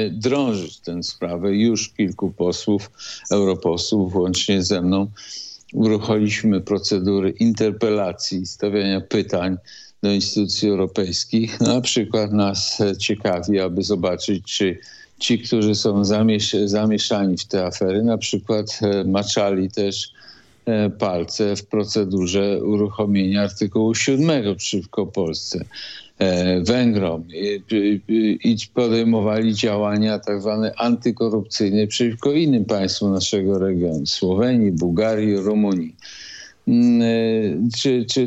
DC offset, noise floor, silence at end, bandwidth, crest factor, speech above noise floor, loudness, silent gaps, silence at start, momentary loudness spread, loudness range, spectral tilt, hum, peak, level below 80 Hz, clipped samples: under 0.1%; -48 dBFS; 0 s; 8.2 kHz; 16 dB; 28 dB; -20 LUFS; none; 0 s; 7 LU; 2 LU; -5 dB/octave; none; -4 dBFS; -58 dBFS; under 0.1%